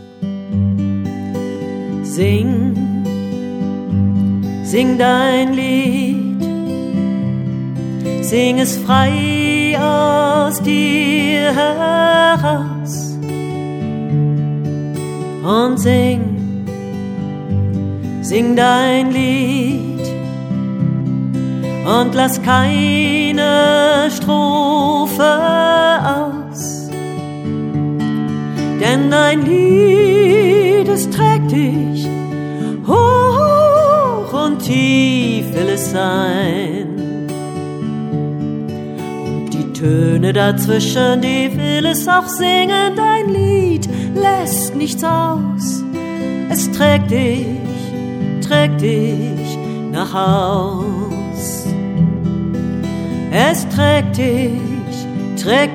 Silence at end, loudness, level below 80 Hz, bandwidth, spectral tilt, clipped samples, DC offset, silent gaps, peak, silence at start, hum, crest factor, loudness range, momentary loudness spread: 0 s; -15 LUFS; -50 dBFS; 18 kHz; -5.5 dB/octave; under 0.1%; under 0.1%; none; 0 dBFS; 0 s; none; 14 dB; 5 LU; 11 LU